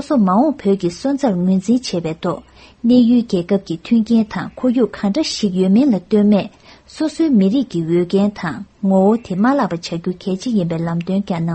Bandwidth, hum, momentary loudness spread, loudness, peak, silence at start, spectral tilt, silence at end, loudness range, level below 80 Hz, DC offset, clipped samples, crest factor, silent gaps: 8.8 kHz; none; 9 LU; -17 LUFS; -2 dBFS; 0 s; -7 dB/octave; 0 s; 2 LU; -50 dBFS; under 0.1%; under 0.1%; 14 dB; none